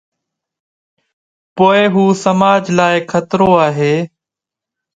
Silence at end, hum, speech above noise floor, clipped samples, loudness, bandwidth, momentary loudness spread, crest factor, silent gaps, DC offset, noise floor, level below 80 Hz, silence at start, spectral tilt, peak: 0.9 s; none; 74 dB; under 0.1%; -12 LUFS; 9.2 kHz; 7 LU; 14 dB; none; under 0.1%; -85 dBFS; -52 dBFS; 1.55 s; -6 dB/octave; 0 dBFS